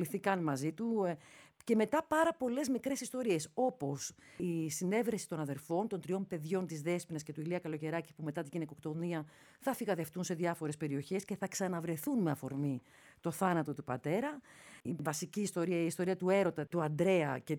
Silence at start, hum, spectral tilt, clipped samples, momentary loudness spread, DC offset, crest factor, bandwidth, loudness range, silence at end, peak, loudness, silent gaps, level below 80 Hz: 0 s; none; -5.5 dB/octave; under 0.1%; 10 LU; under 0.1%; 18 dB; 19.5 kHz; 4 LU; 0 s; -18 dBFS; -36 LUFS; none; -76 dBFS